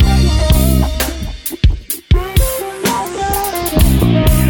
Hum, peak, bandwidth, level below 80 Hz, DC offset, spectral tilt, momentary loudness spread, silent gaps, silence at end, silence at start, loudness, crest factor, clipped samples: none; 0 dBFS; over 20 kHz; -16 dBFS; under 0.1%; -5.5 dB/octave; 7 LU; none; 0 s; 0 s; -15 LUFS; 12 dB; under 0.1%